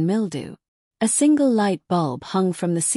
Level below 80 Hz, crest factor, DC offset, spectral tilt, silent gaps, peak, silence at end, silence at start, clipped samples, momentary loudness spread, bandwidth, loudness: -66 dBFS; 12 dB; under 0.1%; -5 dB/octave; 0.68-0.91 s; -8 dBFS; 0 s; 0 s; under 0.1%; 10 LU; 13.5 kHz; -21 LUFS